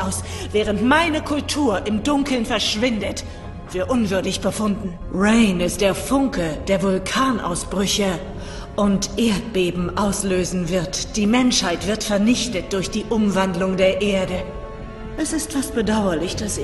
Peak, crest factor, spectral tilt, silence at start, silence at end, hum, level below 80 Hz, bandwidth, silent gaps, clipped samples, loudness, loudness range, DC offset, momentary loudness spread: -4 dBFS; 16 dB; -4.5 dB/octave; 0 s; 0 s; none; -36 dBFS; 12.5 kHz; none; under 0.1%; -20 LUFS; 2 LU; under 0.1%; 10 LU